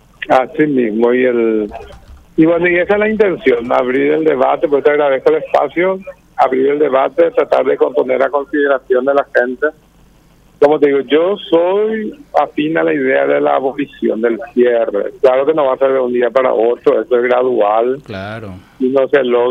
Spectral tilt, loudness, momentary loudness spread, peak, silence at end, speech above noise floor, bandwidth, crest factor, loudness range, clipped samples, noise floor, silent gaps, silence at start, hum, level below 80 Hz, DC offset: -7.5 dB/octave; -13 LUFS; 6 LU; 0 dBFS; 0 s; 34 dB; 6.8 kHz; 12 dB; 2 LU; under 0.1%; -47 dBFS; none; 0.2 s; none; -50 dBFS; under 0.1%